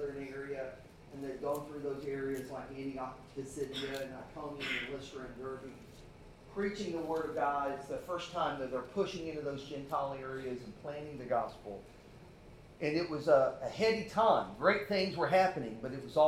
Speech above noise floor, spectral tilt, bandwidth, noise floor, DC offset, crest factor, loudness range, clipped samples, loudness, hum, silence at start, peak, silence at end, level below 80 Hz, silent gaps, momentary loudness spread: 20 dB; -5.5 dB/octave; 15.5 kHz; -55 dBFS; under 0.1%; 22 dB; 10 LU; under 0.1%; -36 LUFS; none; 0 s; -14 dBFS; 0 s; -62 dBFS; none; 18 LU